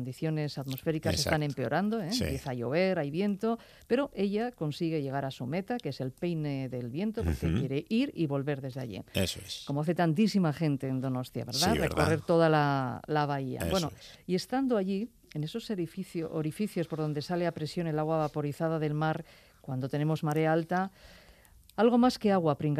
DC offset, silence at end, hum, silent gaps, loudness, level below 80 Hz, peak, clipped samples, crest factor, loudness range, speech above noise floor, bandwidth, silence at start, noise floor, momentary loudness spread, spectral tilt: under 0.1%; 0 s; none; none; -31 LUFS; -54 dBFS; -10 dBFS; under 0.1%; 20 dB; 5 LU; 27 dB; 15 kHz; 0 s; -58 dBFS; 9 LU; -6 dB/octave